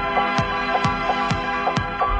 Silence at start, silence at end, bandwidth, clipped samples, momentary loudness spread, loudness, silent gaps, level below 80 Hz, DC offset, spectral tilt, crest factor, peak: 0 s; 0 s; 10 kHz; under 0.1%; 2 LU; -21 LUFS; none; -36 dBFS; under 0.1%; -5 dB/octave; 18 dB; -4 dBFS